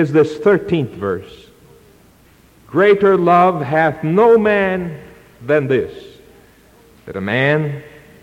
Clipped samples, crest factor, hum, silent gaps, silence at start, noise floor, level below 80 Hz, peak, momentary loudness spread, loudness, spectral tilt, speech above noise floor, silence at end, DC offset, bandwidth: under 0.1%; 16 dB; none; none; 0 s; -49 dBFS; -52 dBFS; -2 dBFS; 16 LU; -15 LUFS; -8 dB/octave; 34 dB; 0.35 s; under 0.1%; 11 kHz